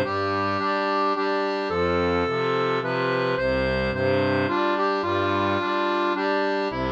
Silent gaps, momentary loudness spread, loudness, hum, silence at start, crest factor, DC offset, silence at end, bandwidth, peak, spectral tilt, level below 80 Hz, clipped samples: none; 2 LU; -23 LUFS; none; 0 s; 12 dB; under 0.1%; 0 s; 8.4 kHz; -10 dBFS; -6.5 dB/octave; -46 dBFS; under 0.1%